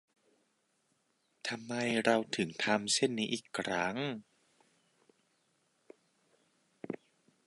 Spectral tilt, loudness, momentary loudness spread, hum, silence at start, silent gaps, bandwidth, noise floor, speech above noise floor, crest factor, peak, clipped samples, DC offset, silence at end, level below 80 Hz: -3.5 dB/octave; -33 LUFS; 16 LU; none; 1.45 s; none; 11.5 kHz; -77 dBFS; 43 dB; 26 dB; -12 dBFS; under 0.1%; under 0.1%; 0.5 s; -78 dBFS